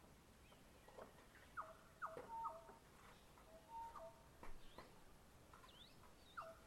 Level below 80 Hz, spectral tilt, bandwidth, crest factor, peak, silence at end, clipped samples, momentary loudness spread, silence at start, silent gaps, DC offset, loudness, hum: -68 dBFS; -4 dB/octave; 16 kHz; 20 dB; -38 dBFS; 0 s; under 0.1%; 15 LU; 0 s; none; under 0.1%; -59 LUFS; none